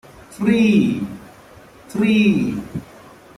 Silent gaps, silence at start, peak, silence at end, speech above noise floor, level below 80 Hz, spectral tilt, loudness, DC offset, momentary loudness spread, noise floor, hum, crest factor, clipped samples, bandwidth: none; 0.3 s; -4 dBFS; 0.55 s; 28 dB; -50 dBFS; -6.5 dB/octave; -18 LUFS; under 0.1%; 17 LU; -44 dBFS; none; 16 dB; under 0.1%; 12.5 kHz